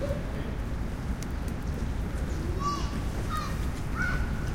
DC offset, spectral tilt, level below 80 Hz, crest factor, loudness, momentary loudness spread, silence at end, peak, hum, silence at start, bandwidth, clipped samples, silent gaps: under 0.1%; -6 dB/octave; -34 dBFS; 14 dB; -33 LUFS; 4 LU; 0 s; -16 dBFS; none; 0 s; 16.5 kHz; under 0.1%; none